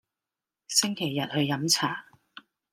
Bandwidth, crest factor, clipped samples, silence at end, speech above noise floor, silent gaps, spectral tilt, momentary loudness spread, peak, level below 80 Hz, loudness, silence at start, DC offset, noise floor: 16 kHz; 22 dB; under 0.1%; 0.35 s; 63 dB; none; -3 dB/octave; 7 LU; -8 dBFS; -74 dBFS; -26 LUFS; 0.7 s; under 0.1%; -90 dBFS